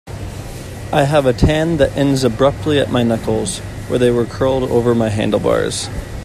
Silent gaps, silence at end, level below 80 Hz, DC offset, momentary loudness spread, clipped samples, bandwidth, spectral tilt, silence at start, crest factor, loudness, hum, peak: none; 0 s; -32 dBFS; under 0.1%; 12 LU; under 0.1%; 14.5 kHz; -6 dB/octave; 0.05 s; 16 dB; -16 LUFS; none; 0 dBFS